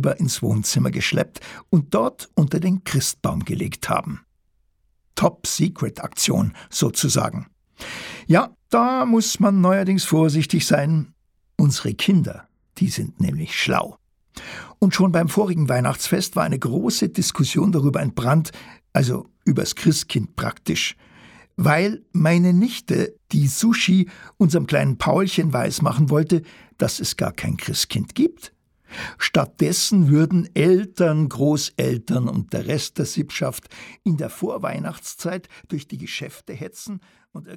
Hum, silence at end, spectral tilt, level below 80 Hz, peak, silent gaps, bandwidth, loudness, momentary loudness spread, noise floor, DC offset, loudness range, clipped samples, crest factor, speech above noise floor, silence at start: none; 0 s; -5 dB/octave; -52 dBFS; -4 dBFS; none; 18 kHz; -20 LUFS; 14 LU; -65 dBFS; under 0.1%; 5 LU; under 0.1%; 18 dB; 44 dB; 0 s